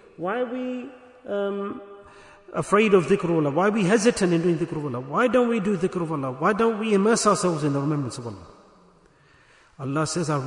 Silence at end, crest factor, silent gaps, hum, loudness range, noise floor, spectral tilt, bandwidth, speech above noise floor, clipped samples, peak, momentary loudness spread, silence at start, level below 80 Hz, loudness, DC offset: 0 s; 18 dB; none; none; 4 LU; -56 dBFS; -5.5 dB/octave; 11 kHz; 34 dB; under 0.1%; -6 dBFS; 14 LU; 0.2 s; -60 dBFS; -23 LUFS; under 0.1%